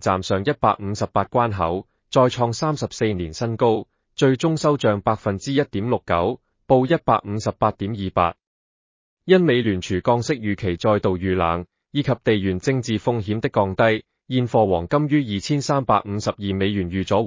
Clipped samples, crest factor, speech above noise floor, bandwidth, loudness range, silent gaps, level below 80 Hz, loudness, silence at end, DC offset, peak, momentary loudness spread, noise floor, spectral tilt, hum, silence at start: under 0.1%; 18 dB; over 70 dB; 7.6 kHz; 1 LU; 8.47-9.17 s; -44 dBFS; -21 LUFS; 0 s; under 0.1%; -4 dBFS; 6 LU; under -90 dBFS; -6.5 dB/octave; none; 0 s